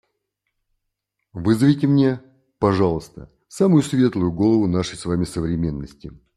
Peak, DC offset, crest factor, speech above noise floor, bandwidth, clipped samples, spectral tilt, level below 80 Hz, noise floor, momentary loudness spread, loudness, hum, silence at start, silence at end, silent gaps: -4 dBFS; under 0.1%; 18 dB; 59 dB; 12.5 kHz; under 0.1%; -7.5 dB/octave; -46 dBFS; -78 dBFS; 14 LU; -20 LUFS; none; 1.35 s; 0.3 s; none